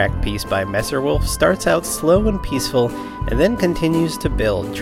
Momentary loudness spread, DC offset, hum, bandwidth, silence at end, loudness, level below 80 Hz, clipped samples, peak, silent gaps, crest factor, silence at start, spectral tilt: 5 LU; under 0.1%; none; 16.5 kHz; 0 s; -19 LUFS; -28 dBFS; under 0.1%; -2 dBFS; none; 16 dB; 0 s; -5 dB/octave